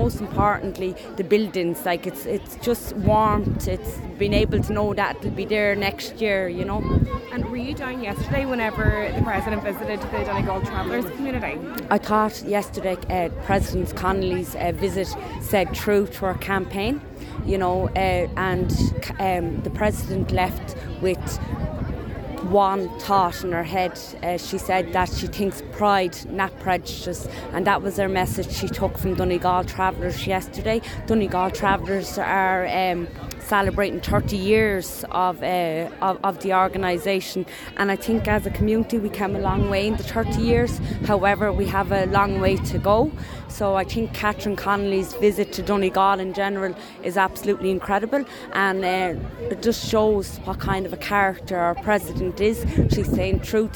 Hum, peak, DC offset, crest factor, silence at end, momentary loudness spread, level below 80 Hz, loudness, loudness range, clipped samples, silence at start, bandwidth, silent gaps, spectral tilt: none; -6 dBFS; under 0.1%; 18 dB; 0 s; 8 LU; -36 dBFS; -23 LUFS; 3 LU; under 0.1%; 0 s; 19 kHz; none; -6 dB/octave